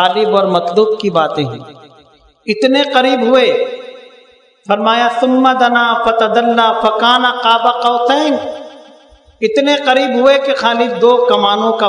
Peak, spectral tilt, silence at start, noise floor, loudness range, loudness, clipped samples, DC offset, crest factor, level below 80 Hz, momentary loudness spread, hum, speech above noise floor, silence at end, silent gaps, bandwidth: 0 dBFS; -4.5 dB/octave; 0 s; -47 dBFS; 3 LU; -12 LUFS; 0.2%; under 0.1%; 12 dB; -56 dBFS; 9 LU; none; 35 dB; 0 s; none; 10.5 kHz